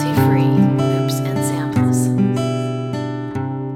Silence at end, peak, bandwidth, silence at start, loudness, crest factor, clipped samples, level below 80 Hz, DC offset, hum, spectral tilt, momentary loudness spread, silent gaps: 0 s; -2 dBFS; 16 kHz; 0 s; -18 LUFS; 14 dB; under 0.1%; -50 dBFS; under 0.1%; none; -7 dB/octave; 9 LU; none